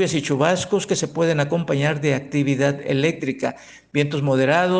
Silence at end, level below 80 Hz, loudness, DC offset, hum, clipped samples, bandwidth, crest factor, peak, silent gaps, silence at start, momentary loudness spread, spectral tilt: 0 s; -58 dBFS; -21 LUFS; under 0.1%; none; under 0.1%; 10 kHz; 18 dB; -2 dBFS; none; 0 s; 6 LU; -5.5 dB/octave